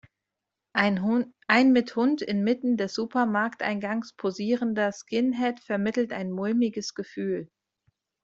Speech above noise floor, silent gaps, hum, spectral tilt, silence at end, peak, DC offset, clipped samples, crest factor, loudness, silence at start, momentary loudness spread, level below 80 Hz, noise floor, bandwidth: 60 dB; none; none; -5.5 dB/octave; 0.8 s; -4 dBFS; under 0.1%; under 0.1%; 22 dB; -26 LUFS; 0.75 s; 9 LU; -70 dBFS; -86 dBFS; 7.8 kHz